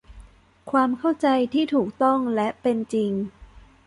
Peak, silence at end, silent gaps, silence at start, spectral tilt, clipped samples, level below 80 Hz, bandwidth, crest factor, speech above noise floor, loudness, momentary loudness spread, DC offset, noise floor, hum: -8 dBFS; 0.3 s; none; 0.1 s; -6.5 dB/octave; under 0.1%; -54 dBFS; 11 kHz; 16 dB; 26 dB; -23 LUFS; 5 LU; under 0.1%; -48 dBFS; none